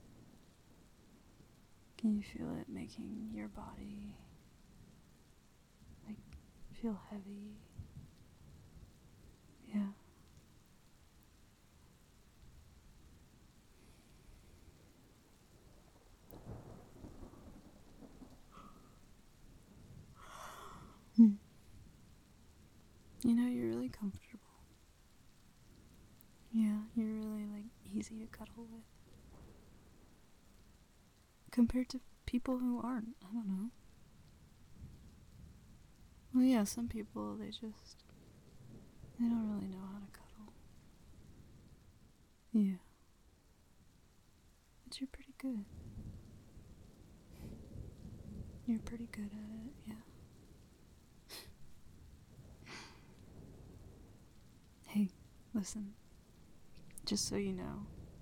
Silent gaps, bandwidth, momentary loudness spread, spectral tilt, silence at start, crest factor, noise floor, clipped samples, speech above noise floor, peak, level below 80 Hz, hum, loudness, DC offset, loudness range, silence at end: none; 18.5 kHz; 27 LU; -5.5 dB/octave; 0.05 s; 28 dB; -67 dBFS; under 0.1%; 27 dB; -16 dBFS; -62 dBFS; none; -40 LUFS; under 0.1%; 20 LU; 0 s